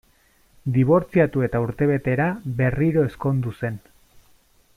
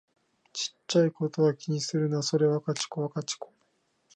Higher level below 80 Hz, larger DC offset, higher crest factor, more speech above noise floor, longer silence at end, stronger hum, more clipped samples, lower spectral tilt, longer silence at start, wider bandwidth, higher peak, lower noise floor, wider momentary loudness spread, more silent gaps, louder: first, -46 dBFS vs -78 dBFS; neither; about the same, 16 dB vs 16 dB; second, 38 dB vs 44 dB; first, 1 s vs 0.7 s; neither; neither; first, -9.5 dB/octave vs -5 dB/octave; about the same, 0.65 s vs 0.55 s; first, 12 kHz vs 10 kHz; first, -6 dBFS vs -12 dBFS; second, -59 dBFS vs -72 dBFS; about the same, 11 LU vs 10 LU; neither; first, -22 LUFS vs -28 LUFS